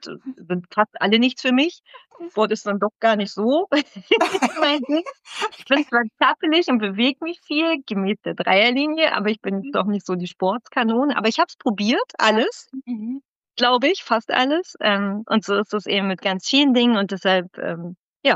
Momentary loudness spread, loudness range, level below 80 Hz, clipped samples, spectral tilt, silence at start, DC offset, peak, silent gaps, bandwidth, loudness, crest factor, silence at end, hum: 11 LU; 2 LU; -76 dBFS; under 0.1%; -4.5 dB/octave; 0 s; under 0.1%; -4 dBFS; 13.28-13.41 s, 17.99-18.20 s; 11 kHz; -20 LUFS; 16 dB; 0 s; none